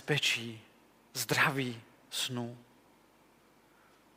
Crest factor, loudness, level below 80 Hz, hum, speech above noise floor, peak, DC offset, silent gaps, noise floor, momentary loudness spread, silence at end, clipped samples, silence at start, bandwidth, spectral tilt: 22 dB; -32 LUFS; -78 dBFS; none; 31 dB; -14 dBFS; under 0.1%; none; -64 dBFS; 20 LU; 1.55 s; under 0.1%; 0 s; 16 kHz; -3 dB/octave